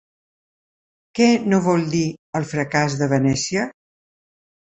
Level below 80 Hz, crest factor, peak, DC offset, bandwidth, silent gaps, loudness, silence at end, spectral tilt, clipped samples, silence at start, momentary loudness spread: -56 dBFS; 18 dB; -2 dBFS; under 0.1%; 8.2 kHz; 2.19-2.33 s; -20 LUFS; 0.95 s; -5.5 dB/octave; under 0.1%; 1.15 s; 8 LU